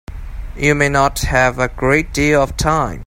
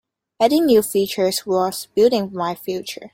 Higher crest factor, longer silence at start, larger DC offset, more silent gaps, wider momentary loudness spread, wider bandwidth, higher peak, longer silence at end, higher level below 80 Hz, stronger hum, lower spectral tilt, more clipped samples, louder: about the same, 16 dB vs 16 dB; second, 0.1 s vs 0.4 s; neither; neither; about the same, 10 LU vs 10 LU; about the same, 16.5 kHz vs 16.5 kHz; about the same, 0 dBFS vs -2 dBFS; about the same, 0 s vs 0.05 s; first, -28 dBFS vs -62 dBFS; neither; about the same, -5 dB/octave vs -4.5 dB/octave; neither; first, -15 LUFS vs -19 LUFS